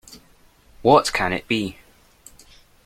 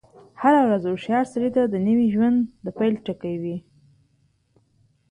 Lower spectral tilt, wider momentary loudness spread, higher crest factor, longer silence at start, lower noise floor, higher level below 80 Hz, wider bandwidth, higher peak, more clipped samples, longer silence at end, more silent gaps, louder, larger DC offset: second, -4.5 dB/octave vs -8 dB/octave; second, 8 LU vs 11 LU; first, 22 dB vs 16 dB; second, 0.1 s vs 0.4 s; second, -54 dBFS vs -65 dBFS; first, -48 dBFS vs -60 dBFS; first, 16.5 kHz vs 10 kHz; first, -2 dBFS vs -6 dBFS; neither; second, 1.15 s vs 1.5 s; neither; about the same, -20 LUFS vs -22 LUFS; neither